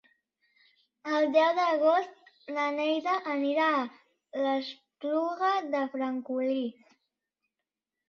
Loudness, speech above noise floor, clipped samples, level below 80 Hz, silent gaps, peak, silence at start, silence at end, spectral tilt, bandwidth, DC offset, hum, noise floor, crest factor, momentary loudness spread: -29 LUFS; 61 dB; under 0.1%; -82 dBFS; none; -12 dBFS; 1.05 s; 1.35 s; -4 dB/octave; 6.8 kHz; under 0.1%; none; -89 dBFS; 18 dB; 14 LU